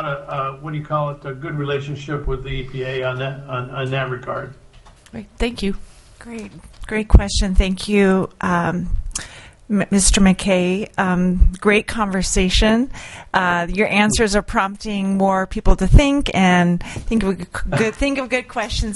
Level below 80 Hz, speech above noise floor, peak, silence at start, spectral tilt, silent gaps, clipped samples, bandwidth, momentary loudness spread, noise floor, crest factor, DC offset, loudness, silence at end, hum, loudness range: -24 dBFS; 27 dB; 0 dBFS; 0 s; -5 dB/octave; none; under 0.1%; 11.5 kHz; 13 LU; -45 dBFS; 18 dB; under 0.1%; -19 LUFS; 0 s; none; 9 LU